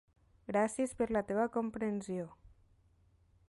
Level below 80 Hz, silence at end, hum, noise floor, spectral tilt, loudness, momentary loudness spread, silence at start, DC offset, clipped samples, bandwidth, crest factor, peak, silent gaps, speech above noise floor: -64 dBFS; 1.15 s; none; -69 dBFS; -6 dB/octave; -36 LUFS; 9 LU; 0.5 s; under 0.1%; under 0.1%; 11.5 kHz; 16 dB; -22 dBFS; none; 34 dB